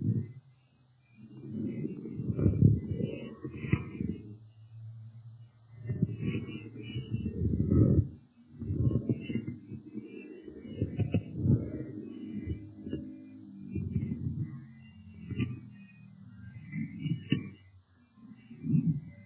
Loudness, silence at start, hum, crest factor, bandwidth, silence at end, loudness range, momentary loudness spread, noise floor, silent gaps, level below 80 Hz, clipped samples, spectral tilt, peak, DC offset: -34 LUFS; 0 s; none; 24 dB; 3.7 kHz; 0 s; 8 LU; 22 LU; -65 dBFS; none; -46 dBFS; under 0.1%; -9 dB/octave; -10 dBFS; under 0.1%